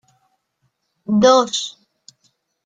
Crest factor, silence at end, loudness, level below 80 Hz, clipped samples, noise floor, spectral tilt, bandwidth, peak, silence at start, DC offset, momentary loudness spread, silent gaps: 20 dB; 0.95 s; -16 LUFS; -60 dBFS; under 0.1%; -69 dBFS; -4 dB/octave; 9.2 kHz; -2 dBFS; 1.1 s; under 0.1%; 18 LU; none